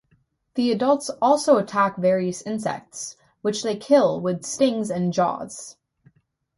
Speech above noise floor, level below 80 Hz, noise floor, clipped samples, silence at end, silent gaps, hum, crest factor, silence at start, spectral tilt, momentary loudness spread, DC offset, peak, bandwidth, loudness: 44 dB; -66 dBFS; -65 dBFS; under 0.1%; 0.85 s; none; none; 18 dB; 0.55 s; -5 dB/octave; 15 LU; under 0.1%; -4 dBFS; 11.5 kHz; -22 LUFS